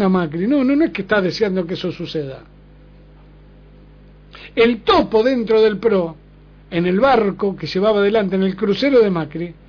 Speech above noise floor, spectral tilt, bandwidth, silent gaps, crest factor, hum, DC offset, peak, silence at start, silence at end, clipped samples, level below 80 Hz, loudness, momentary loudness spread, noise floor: 28 dB; -7.5 dB/octave; 5.4 kHz; none; 14 dB; 50 Hz at -45 dBFS; under 0.1%; -4 dBFS; 0 s; 0.15 s; under 0.1%; -46 dBFS; -17 LUFS; 11 LU; -44 dBFS